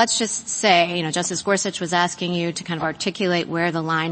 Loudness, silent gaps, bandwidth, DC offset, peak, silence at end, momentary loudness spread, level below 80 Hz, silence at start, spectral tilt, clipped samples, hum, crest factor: -21 LUFS; none; 8.8 kHz; under 0.1%; -2 dBFS; 0 s; 8 LU; -62 dBFS; 0 s; -3 dB/octave; under 0.1%; none; 20 dB